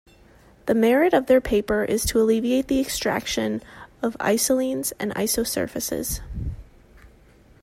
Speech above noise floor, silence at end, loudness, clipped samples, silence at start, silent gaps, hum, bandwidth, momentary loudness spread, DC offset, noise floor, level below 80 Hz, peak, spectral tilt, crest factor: 31 dB; 0.55 s; -22 LUFS; under 0.1%; 0.65 s; none; none; 16 kHz; 11 LU; under 0.1%; -53 dBFS; -42 dBFS; -6 dBFS; -4 dB/octave; 16 dB